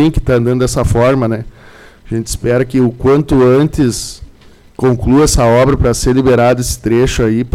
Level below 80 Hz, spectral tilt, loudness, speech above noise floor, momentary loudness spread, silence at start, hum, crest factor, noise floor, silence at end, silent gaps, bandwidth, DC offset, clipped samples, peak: -24 dBFS; -6 dB/octave; -12 LUFS; 30 dB; 9 LU; 0 s; none; 8 dB; -41 dBFS; 0.05 s; none; 16 kHz; under 0.1%; under 0.1%; -4 dBFS